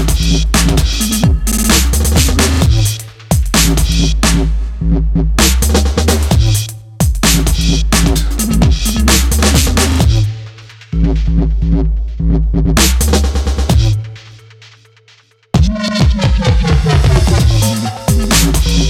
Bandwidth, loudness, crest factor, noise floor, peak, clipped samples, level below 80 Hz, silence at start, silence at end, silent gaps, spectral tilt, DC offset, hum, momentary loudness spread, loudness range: 16.5 kHz; -12 LUFS; 12 dB; -48 dBFS; 0 dBFS; under 0.1%; -14 dBFS; 0 s; 0 s; none; -4.5 dB/octave; under 0.1%; none; 6 LU; 3 LU